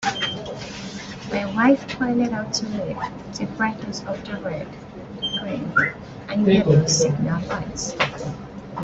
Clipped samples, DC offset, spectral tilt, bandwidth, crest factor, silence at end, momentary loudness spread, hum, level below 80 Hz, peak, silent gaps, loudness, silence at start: under 0.1%; under 0.1%; -4.5 dB/octave; 8.2 kHz; 20 dB; 0 s; 15 LU; none; -50 dBFS; -4 dBFS; none; -23 LUFS; 0 s